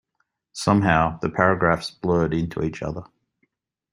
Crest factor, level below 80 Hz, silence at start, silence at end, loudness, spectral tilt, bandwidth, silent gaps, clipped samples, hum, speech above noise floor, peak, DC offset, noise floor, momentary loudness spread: 22 dB; -46 dBFS; 0.55 s; 0.9 s; -22 LUFS; -6.5 dB/octave; 12 kHz; none; under 0.1%; none; 52 dB; -2 dBFS; under 0.1%; -74 dBFS; 13 LU